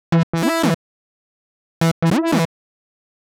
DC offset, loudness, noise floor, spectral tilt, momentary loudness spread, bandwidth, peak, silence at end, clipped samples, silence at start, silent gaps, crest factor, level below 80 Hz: under 0.1%; -19 LUFS; under -90 dBFS; -6 dB/octave; 6 LU; 17 kHz; -8 dBFS; 0.9 s; under 0.1%; 0.1 s; 0.23-0.33 s, 0.74-1.81 s, 1.91-2.02 s; 14 dB; -52 dBFS